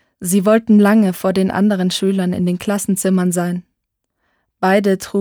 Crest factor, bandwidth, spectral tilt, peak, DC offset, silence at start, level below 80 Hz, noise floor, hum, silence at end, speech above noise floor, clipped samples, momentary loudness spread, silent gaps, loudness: 14 dB; 19.5 kHz; -5.5 dB/octave; -2 dBFS; under 0.1%; 0.2 s; -56 dBFS; -74 dBFS; none; 0 s; 59 dB; under 0.1%; 8 LU; none; -16 LUFS